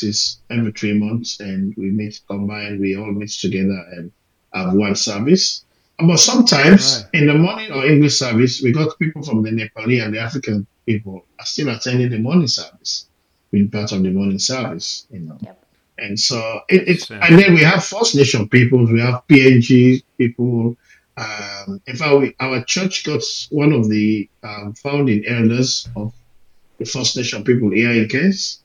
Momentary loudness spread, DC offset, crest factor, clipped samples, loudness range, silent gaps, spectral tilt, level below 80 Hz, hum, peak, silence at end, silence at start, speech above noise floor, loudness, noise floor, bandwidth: 16 LU; under 0.1%; 16 dB; 0.2%; 9 LU; none; -4.5 dB/octave; -56 dBFS; none; 0 dBFS; 0.1 s; 0 s; 33 dB; -16 LUFS; -49 dBFS; 10.5 kHz